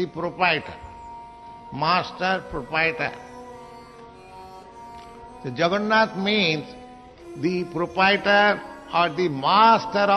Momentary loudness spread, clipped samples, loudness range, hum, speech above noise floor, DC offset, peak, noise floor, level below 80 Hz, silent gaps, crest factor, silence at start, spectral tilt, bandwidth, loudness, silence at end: 25 LU; under 0.1%; 8 LU; none; 23 dB; under 0.1%; -4 dBFS; -44 dBFS; -54 dBFS; none; 20 dB; 0 s; -5.5 dB/octave; 11.5 kHz; -21 LUFS; 0 s